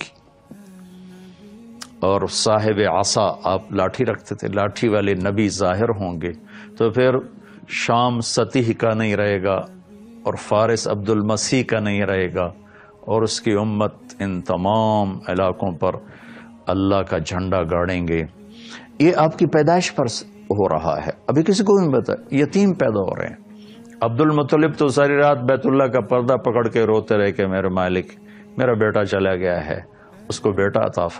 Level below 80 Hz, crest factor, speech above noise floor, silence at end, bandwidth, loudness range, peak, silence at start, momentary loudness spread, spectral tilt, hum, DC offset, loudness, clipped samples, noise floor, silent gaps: -50 dBFS; 18 dB; 27 dB; 0 s; 11 kHz; 4 LU; 0 dBFS; 0 s; 11 LU; -5.5 dB/octave; none; under 0.1%; -19 LUFS; under 0.1%; -46 dBFS; none